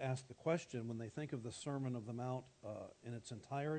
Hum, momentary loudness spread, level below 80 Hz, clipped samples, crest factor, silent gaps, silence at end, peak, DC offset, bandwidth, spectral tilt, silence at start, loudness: none; 10 LU; -78 dBFS; under 0.1%; 18 dB; none; 0 s; -26 dBFS; under 0.1%; 9 kHz; -6.5 dB/octave; 0 s; -45 LUFS